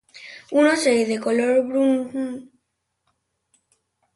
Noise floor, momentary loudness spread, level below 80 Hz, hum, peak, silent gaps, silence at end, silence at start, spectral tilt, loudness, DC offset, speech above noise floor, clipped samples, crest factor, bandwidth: -76 dBFS; 18 LU; -70 dBFS; none; -6 dBFS; none; 1.7 s; 0.15 s; -3.5 dB/octave; -20 LUFS; under 0.1%; 56 dB; under 0.1%; 16 dB; 11.5 kHz